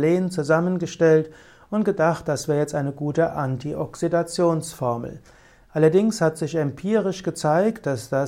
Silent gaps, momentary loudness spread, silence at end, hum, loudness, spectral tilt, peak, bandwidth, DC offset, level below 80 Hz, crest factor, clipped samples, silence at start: none; 9 LU; 0 s; none; -22 LUFS; -6.5 dB/octave; -6 dBFS; 16 kHz; under 0.1%; -56 dBFS; 16 dB; under 0.1%; 0 s